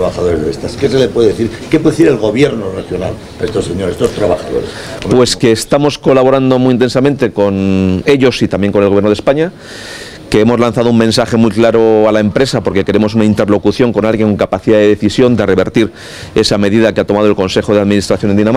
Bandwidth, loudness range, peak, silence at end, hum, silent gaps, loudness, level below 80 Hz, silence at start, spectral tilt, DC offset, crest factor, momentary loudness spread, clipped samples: 15 kHz; 3 LU; 0 dBFS; 0 s; none; none; -11 LUFS; -36 dBFS; 0 s; -6 dB/octave; 0.3%; 10 dB; 9 LU; 0.6%